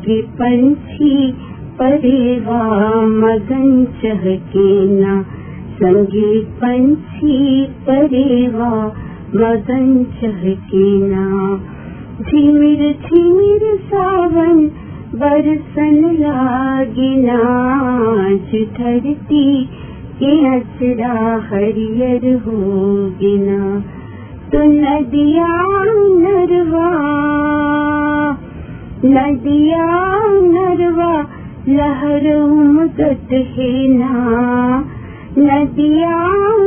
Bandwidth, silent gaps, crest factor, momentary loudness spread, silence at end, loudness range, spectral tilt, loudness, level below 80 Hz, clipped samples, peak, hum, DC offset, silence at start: 3.5 kHz; none; 12 dB; 8 LU; 0 s; 3 LU; -11.5 dB/octave; -13 LUFS; -38 dBFS; under 0.1%; 0 dBFS; none; under 0.1%; 0 s